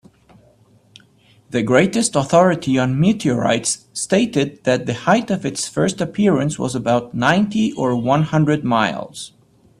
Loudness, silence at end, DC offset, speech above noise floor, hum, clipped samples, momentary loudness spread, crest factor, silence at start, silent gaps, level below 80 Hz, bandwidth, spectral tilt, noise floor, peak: -18 LUFS; 0.5 s; under 0.1%; 35 dB; none; under 0.1%; 7 LU; 18 dB; 1.5 s; none; -52 dBFS; 13 kHz; -5 dB/octave; -53 dBFS; 0 dBFS